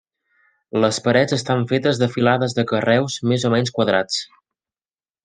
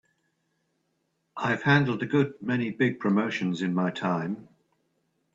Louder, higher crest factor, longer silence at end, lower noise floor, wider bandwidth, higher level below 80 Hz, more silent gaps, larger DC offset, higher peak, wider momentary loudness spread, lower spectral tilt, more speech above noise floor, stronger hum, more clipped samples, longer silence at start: first, -19 LUFS vs -27 LUFS; about the same, 18 dB vs 22 dB; about the same, 1 s vs 0.9 s; first, under -90 dBFS vs -76 dBFS; first, 9.8 kHz vs 7.8 kHz; first, -62 dBFS vs -68 dBFS; neither; neither; first, -2 dBFS vs -8 dBFS; second, 4 LU vs 9 LU; second, -5 dB/octave vs -7 dB/octave; first, over 72 dB vs 50 dB; neither; neither; second, 0.75 s vs 1.35 s